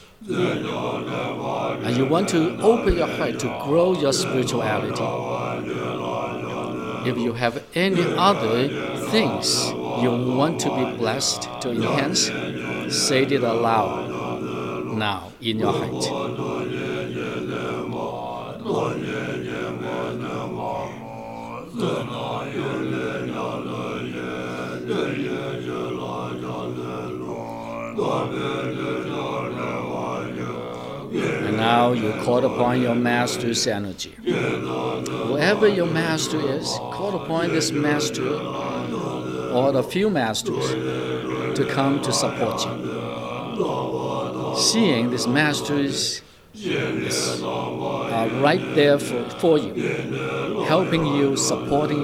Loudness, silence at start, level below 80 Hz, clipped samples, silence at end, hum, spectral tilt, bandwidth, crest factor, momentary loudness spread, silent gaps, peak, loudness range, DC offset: -23 LUFS; 0 s; -48 dBFS; under 0.1%; 0 s; none; -4.5 dB/octave; 16 kHz; 20 dB; 10 LU; none; -2 dBFS; 7 LU; under 0.1%